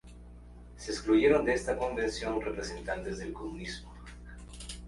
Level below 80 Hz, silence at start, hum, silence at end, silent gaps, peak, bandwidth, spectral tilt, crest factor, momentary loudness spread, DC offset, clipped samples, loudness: -48 dBFS; 0.05 s; 60 Hz at -45 dBFS; 0 s; none; -12 dBFS; 11.5 kHz; -5 dB/octave; 22 dB; 26 LU; under 0.1%; under 0.1%; -31 LUFS